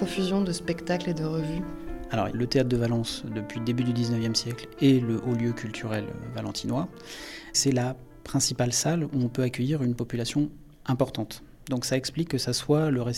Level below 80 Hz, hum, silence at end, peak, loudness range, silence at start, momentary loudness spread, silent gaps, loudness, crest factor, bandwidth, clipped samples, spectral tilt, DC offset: -48 dBFS; none; 0 s; -10 dBFS; 3 LU; 0 s; 11 LU; none; -28 LUFS; 18 dB; 16 kHz; under 0.1%; -5 dB/octave; under 0.1%